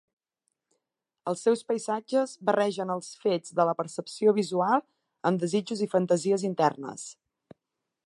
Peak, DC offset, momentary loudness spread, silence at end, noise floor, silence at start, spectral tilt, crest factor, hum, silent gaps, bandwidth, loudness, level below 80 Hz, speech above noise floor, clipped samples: -8 dBFS; under 0.1%; 9 LU; 0.95 s; -85 dBFS; 1.25 s; -5.5 dB/octave; 20 dB; none; none; 11.5 kHz; -27 LUFS; -80 dBFS; 58 dB; under 0.1%